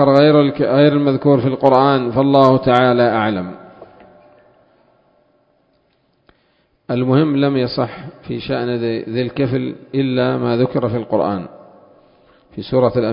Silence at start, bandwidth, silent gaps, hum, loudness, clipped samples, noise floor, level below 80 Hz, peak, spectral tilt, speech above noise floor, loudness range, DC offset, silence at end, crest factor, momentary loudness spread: 0 s; 5.4 kHz; none; none; -16 LUFS; under 0.1%; -61 dBFS; -50 dBFS; 0 dBFS; -9 dB/octave; 46 dB; 9 LU; under 0.1%; 0 s; 16 dB; 13 LU